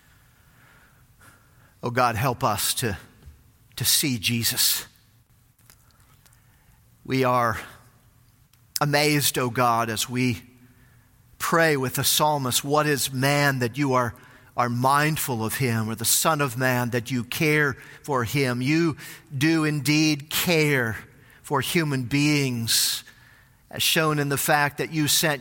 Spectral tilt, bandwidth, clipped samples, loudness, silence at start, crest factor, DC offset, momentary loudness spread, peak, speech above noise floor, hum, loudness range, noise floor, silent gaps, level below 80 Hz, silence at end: -3.5 dB/octave; 17 kHz; under 0.1%; -22 LUFS; 1.85 s; 20 dB; under 0.1%; 9 LU; -4 dBFS; 36 dB; none; 5 LU; -59 dBFS; none; -58 dBFS; 0 s